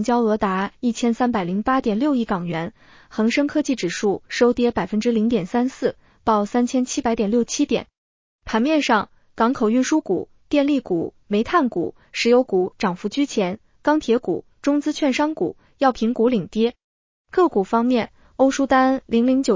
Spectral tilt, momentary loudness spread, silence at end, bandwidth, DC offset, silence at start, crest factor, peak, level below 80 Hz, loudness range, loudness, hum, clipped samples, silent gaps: -5 dB/octave; 8 LU; 0 s; 7.6 kHz; under 0.1%; 0 s; 16 dB; -4 dBFS; -52 dBFS; 2 LU; -21 LUFS; none; under 0.1%; 7.98-8.39 s, 16.84-17.25 s